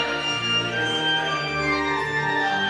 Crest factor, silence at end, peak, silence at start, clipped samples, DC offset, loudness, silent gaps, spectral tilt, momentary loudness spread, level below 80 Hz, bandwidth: 12 dB; 0 s; -12 dBFS; 0 s; under 0.1%; under 0.1%; -22 LUFS; none; -3.5 dB/octave; 2 LU; -50 dBFS; 13 kHz